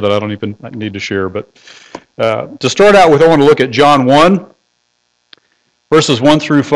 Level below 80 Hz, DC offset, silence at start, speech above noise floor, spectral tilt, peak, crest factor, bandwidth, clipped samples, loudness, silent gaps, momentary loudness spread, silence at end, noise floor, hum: -44 dBFS; under 0.1%; 0 s; 52 dB; -5.5 dB/octave; 0 dBFS; 12 dB; 11.5 kHz; under 0.1%; -10 LUFS; none; 15 LU; 0 s; -62 dBFS; 60 Hz at -45 dBFS